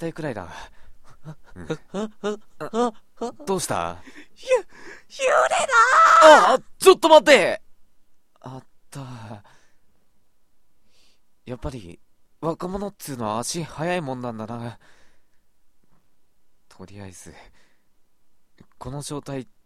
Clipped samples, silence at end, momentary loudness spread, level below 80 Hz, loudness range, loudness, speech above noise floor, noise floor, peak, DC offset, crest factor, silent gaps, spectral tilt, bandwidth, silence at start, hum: under 0.1%; 0.2 s; 28 LU; -52 dBFS; 24 LU; -19 LUFS; 42 dB; -63 dBFS; 0 dBFS; 0.3%; 22 dB; none; -3.5 dB/octave; 15.5 kHz; 0 s; none